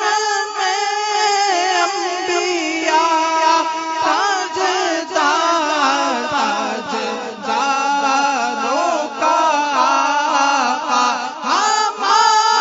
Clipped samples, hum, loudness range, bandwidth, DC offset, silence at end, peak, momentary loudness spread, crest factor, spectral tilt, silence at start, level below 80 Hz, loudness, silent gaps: under 0.1%; none; 2 LU; 7.8 kHz; under 0.1%; 0 s; 0 dBFS; 5 LU; 16 dB; -0.5 dB/octave; 0 s; -70 dBFS; -16 LUFS; none